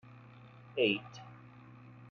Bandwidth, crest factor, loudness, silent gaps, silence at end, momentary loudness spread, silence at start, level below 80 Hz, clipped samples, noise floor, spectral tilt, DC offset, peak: 7 kHz; 22 dB; -33 LUFS; none; 0 s; 24 LU; 0.45 s; -78 dBFS; under 0.1%; -55 dBFS; -3 dB/octave; under 0.1%; -16 dBFS